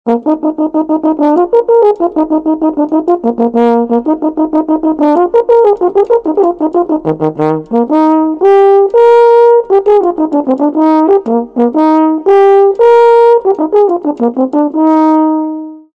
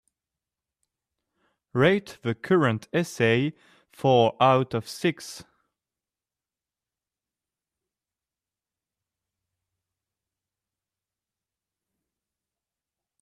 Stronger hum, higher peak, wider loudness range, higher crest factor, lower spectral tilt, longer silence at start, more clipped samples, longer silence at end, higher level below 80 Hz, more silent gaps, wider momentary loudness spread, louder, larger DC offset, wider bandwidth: neither; first, 0 dBFS vs -6 dBFS; second, 3 LU vs 8 LU; second, 8 dB vs 22 dB; first, -8.5 dB/octave vs -6 dB/octave; second, 0.05 s vs 1.75 s; first, 2% vs under 0.1%; second, 0.15 s vs 7.8 s; first, -50 dBFS vs -68 dBFS; neither; second, 7 LU vs 12 LU; first, -9 LUFS vs -24 LUFS; neither; second, 5.8 kHz vs 14.5 kHz